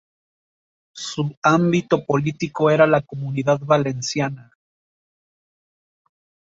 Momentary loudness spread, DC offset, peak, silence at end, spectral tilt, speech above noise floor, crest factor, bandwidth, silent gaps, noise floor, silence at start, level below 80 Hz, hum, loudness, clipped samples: 11 LU; under 0.1%; -2 dBFS; 2.15 s; -6 dB/octave; over 71 dB; 20 dB; 7.8 kHz; 1.37-1.42 s; under -90 dBFS; 0.95 s; -60 dBFS; none; -20 LUFS; under 0.1%